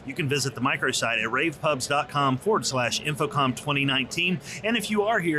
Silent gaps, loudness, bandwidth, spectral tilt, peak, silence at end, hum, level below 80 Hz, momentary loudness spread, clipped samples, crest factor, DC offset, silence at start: none; -25 LUFS; 14 kHz; -4 dB/octave; -12 dBFS; 0 s; none; -60 dBFS; 3 LU; under 0.1%; 12 dB; under 0.1%; 0 s